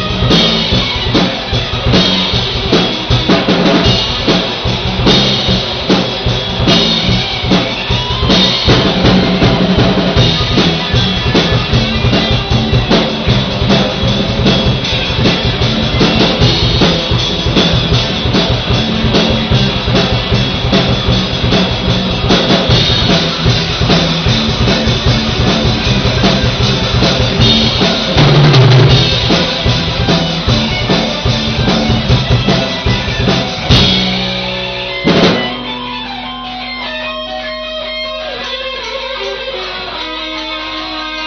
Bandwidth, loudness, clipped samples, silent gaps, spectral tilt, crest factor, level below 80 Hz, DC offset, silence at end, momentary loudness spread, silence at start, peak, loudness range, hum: 6.6 kHz; -11 LUFS; under 0.1%; none; -4 dB/octave; 12 dB; -24 dBFS; under 0.1%; 0 s; 10 LU; 0 s; 0 dBFS; 6 LU; none